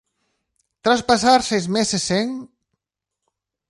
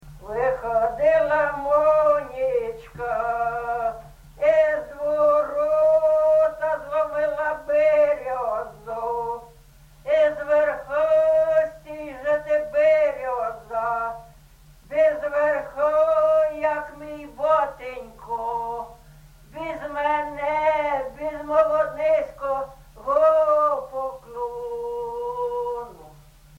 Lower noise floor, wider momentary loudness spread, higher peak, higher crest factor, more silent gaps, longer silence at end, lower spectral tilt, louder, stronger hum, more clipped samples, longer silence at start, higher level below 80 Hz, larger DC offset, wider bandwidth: first, -83 dBFS vs -50 dBFS; second, 10 LU vs 14 LU; first, -2 dBFS vs -8 dBFS; first, 20 dB vs 14 dB; neither; first, 1.25 s vs 0.5 s; second, -3.5 dB/octave vs -5.5 dB/octave; first, -19 LUFS vs -22 LUFS; neither; neither; first, 0.85 s vs 0.05 s; about the same, -54 dBFS vs -50 dBFS; neither; first, 11.5 kHz vs 8.2 kHz